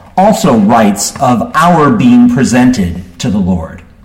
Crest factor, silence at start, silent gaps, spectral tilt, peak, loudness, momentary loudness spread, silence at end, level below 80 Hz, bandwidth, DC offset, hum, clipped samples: 8 dB; 0.15 s; none; -5.5 dB/octave; 0 dBFS; -9 LUFS; 10 LU; 0.3 s; -34 dBFS; 16.5 kHz; under 0.1%; none; under 0.1%